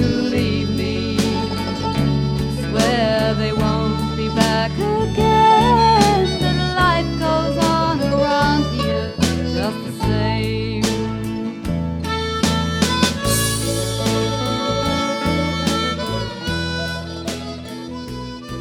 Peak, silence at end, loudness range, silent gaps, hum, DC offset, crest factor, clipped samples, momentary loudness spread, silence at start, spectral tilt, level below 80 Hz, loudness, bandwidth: 0 dBFS; 0 s; 6 LU; none; none; under 0.1%; 18 dB; under 0.1%; 8 LU; 0 s; -5 dB/octave; -32 dBFS; -19 LUFS; 19.5 kHz